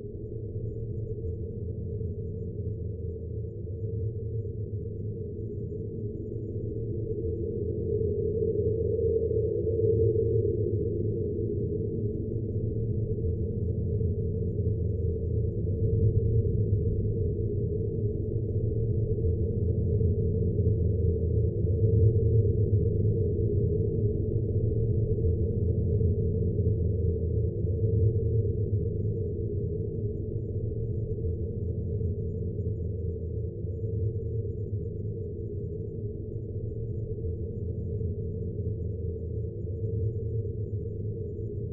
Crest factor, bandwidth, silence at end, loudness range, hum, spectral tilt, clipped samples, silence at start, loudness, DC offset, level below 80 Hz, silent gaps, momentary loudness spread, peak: 16 dB; 0.8 kHz; 0 s; 9 LU; none; -16.5 dB/octave; under 0.1%; 0 s; -30 LUFS; under 0.1%; -40 dBFS; none; 9 LU; -12 dBFS